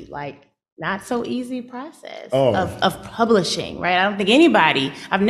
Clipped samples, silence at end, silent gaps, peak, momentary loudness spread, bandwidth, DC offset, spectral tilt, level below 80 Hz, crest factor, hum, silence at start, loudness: under 0.1%; 0 s; 0.72-0.77 s; -2 dBFS; 19 LU; 13.5 kHz; under 0.1%; -5 dB/octave; -54 dBFS; 18 dB; none; 0 s; -19 LUFS